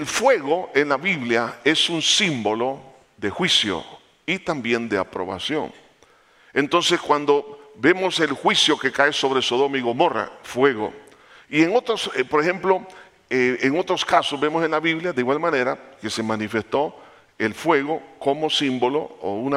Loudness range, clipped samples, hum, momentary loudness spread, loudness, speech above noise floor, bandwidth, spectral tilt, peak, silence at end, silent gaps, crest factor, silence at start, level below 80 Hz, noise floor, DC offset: 4 LU; under 0.1%; none; 9 LU; -21 LUFS; 34 dB; 15 kHz; -3.5 dB/octave; -2 dBFS; 0 s; none; 20 dB; 0 s; -62 dBFS; -55 dBFS; under 0.1%